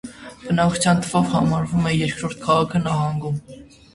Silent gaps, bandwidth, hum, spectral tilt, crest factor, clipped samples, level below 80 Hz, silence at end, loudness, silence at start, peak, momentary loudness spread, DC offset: none; 11.5 kHz; none; -5.5 dB/octave; 18 dB; under 0.1%; -46 dBFS; 0.3 s; -20 LUFS; 0.05 s; -4 dBFS; 10 LU; under 0.1%